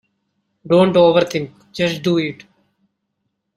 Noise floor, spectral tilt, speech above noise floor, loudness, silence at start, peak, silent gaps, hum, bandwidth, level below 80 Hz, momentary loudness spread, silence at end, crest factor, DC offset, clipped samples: -73 dBFS; -6.5 dB/octave; 58 dB; -16 LUFS; 0.65 s; -2 dBFS; none; none; 13 kHz; -58 dBFS; 14 LU; 1.25 s; 18 dB; under 0.1%; under 0.1%